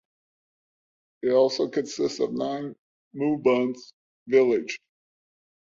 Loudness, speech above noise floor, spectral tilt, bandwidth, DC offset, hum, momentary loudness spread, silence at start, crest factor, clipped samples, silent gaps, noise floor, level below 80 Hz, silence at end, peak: -25 LUFS; over 66 dB; -5 dB/octave; 7.6 kHz; under 0.1%; none; 15 LU; 1.25 s; 20 dB; under 0.1%; 2.79-3.11 s, 3.93-4.26 s; under -90 dBFS; -72 dBFS; 1 s; -8 dBFS